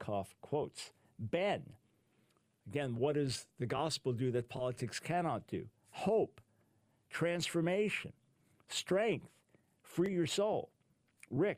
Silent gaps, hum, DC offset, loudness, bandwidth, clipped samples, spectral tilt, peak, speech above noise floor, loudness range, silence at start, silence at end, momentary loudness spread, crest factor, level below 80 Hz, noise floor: none; none; under 0.1%; -37 LUFS; 15.5 kHz; under 0.1%; -5 dB/octave; -20 dBFS; 38 dB; 2 LU; 0 s; 0 s; 11 LU; 18 dB; -72 dBFS; -75 dBFS